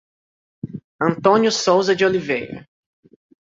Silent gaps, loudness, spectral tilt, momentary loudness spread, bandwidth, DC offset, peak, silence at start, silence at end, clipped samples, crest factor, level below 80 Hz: 0.84-0.99 s; -18 LUFS; -4.5 dB/octave; 18 LU; 7.8 kHz; under 0.1%; -2 dBFS; 0.65 s; 0.9 s; under 0.1%; 18 dB; -60 dBFS